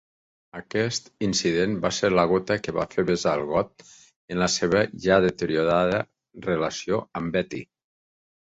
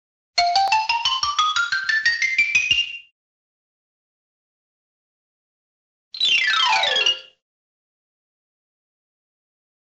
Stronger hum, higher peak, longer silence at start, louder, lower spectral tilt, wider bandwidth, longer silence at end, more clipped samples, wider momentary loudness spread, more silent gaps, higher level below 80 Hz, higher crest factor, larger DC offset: neither; about the same, -6 dBFS vs -6 dBFS; first, 0.55 s vs 0.35 s; second, -24 LUFS vs -18 LUFS; first, -4.5 dB/octave vs 1.5 dB/octave; second, 8.2 kHz vs 10 kHz; second, 0.85 s vs 2.75 s; neither; first, 12 LU vs 7 LU; second, 4.16-4.28 s vs 3.12-6.11 s; first, -52 dBFS vs -62 dBFS; about the same, 20 dB vs 18 dB; neither